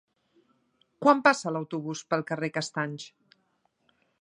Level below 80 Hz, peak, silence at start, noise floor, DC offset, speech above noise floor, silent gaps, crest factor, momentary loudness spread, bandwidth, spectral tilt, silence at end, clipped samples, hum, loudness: -82 dBFS; -4 dBFS; 1 s; -73 dBFS; under 0.1%; 46 dB; none; 26 dB; 13 LU; 11 kHz; -5 dB/octave; 1.15 s; under 0.1%; none; -27 LUFS